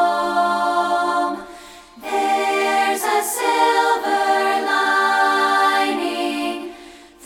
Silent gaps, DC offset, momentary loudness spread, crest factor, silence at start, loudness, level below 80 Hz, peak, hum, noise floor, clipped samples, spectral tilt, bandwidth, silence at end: none; under 0.1%; 9 LU; 14 dB; 0 s; -18 LUFS; -60 dBFS; -4 dBFS; none; -42 dBFS; under 0.1%; -1.5 dB/octave; 17.5 kHz; 0 s